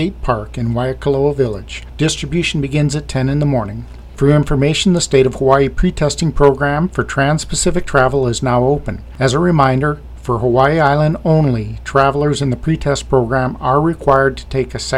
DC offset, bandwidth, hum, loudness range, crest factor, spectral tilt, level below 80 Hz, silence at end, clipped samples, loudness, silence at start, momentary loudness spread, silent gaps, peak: under 0.1%; 12.5 kHz; none; 3 LU; 14 dB; -5.5 dB/octave; -28 dBFS; 0 s; under 0.1%; -15 LUFS; 0 s; 7 LU; none; 0 dBFS